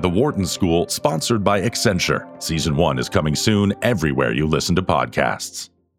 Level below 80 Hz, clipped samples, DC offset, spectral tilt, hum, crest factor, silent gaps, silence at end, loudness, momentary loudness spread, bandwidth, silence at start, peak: -40 dBFS; under 0.1%; under 0.1%; -5 dB/octave; none; 18 dB; none; 0.35 s; -19 LUFS; 4 LU; 17 kHz; 0 s; -2 dBFS